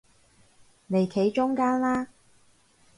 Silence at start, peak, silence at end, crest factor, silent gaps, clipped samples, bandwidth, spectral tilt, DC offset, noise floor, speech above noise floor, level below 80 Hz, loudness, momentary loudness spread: 0.9 s; -12 dBFS; 0.95 s; 16 dB; none; under 0.1%; 11.5 kHz; -7 dB/octave; under 0.1%; -61 dBFS; 36 dB; -64 dBFS; -26 LUFS; 6 LU